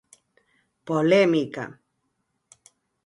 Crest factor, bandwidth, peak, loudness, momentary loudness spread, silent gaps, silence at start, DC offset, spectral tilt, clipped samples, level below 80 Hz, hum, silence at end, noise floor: 20 dB; 11.5 kHz; -6 dBFS; -22 LUFS; 17 LU; none; 0.85 s; under 0.1%; -6.5 dB/octave; under 0.1%; -72 dBFS; none; 1.35 s; -75 dBFS